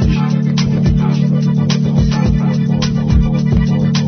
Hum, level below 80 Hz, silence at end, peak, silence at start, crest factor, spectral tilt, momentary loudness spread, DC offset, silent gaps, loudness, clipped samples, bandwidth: none; -22 dBFS; 0 s; -2 dBFS; 0 s; 10 dB; -7 dB/octave; 1 LU; under 0.1%; none; -14 LUFS; under 0.1%; 6.4 kHz